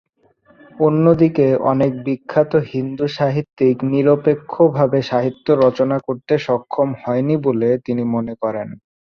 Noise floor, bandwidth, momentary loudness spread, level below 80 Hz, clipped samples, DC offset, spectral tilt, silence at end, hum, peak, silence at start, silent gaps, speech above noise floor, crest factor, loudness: -55 dBFS; 6.8 kHz; 8 LU; -56 dBFS; under 0.1%; under 0.1%; -9 dB/octave; 0.45 s; none; -2 dBFS; 0.75 s; 3.53-3.57 s; 38 dB; 16 dB; -17 LUFS